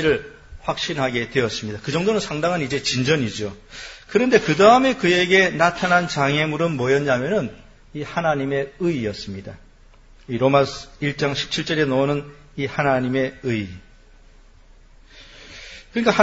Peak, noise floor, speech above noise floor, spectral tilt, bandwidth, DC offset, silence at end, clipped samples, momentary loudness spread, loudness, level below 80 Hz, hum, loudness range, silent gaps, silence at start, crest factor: 0 dBFS; -48 dBFS; 28 dB; -5 dB/octave; 8 kHz; under 0.1%; 0 s; under 0.1%; 18 LU; -20 LUFS; -48 dBFS; none; 9 LU; none; 0 s; 22 dB